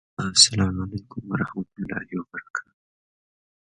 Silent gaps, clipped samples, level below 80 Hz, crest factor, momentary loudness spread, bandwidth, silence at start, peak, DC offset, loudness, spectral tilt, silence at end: 2.50-2.54 s; under 0.1%; -48 dBFS; 26 dB; 18 LU; 11.5 kHz; 0.2 s; -2 dBFS; under 0.1%; -22 LUFS; -2.5 dB/octave; 1 s